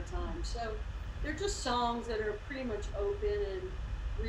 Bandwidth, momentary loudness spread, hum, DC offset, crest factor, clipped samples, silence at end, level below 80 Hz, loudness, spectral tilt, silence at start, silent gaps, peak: 11.5 kHz; 8 LU; none; under 0.1%; 16 dB; under 0.1%; 0 s; -40 dBFS; -37 LUFS; -5 dB/octave; 0 s; none; -20 dBFS